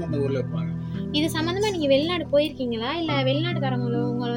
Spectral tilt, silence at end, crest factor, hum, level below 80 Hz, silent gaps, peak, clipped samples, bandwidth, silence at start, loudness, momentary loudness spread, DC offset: -6 dB/octave; 0 s; 16 dB; none; -54 dBFS; none; -8 dBFS; under 0.1%; 16.5 kHz; 0 s; -24 LUFS; 6 LU; under 0.1%